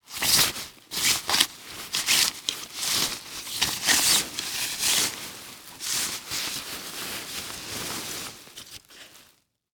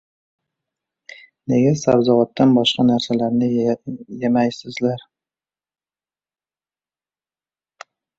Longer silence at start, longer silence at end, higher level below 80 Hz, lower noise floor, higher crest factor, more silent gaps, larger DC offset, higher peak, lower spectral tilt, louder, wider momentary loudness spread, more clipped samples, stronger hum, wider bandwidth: second, 0.1 s vs 1.5 s; second, 0.5 s vs 3.2 s; about the same, -58 dBFS vs -58 dBFS; second, -62 dBFS vs under -90 dBFS; first, 28 dB vs 18 dB; neither; neither; about the same, 0 dBFS vs -2 dBFS; second, 0.5 dB/octave vs -6 dB/octave; second, -24 LUFS vs -18 LUFS; first, 18 LU vs 10 LU; neither; second, none vs 50 Hz at -55 dBFS; first, over 20 kHz vs 7.8 kHz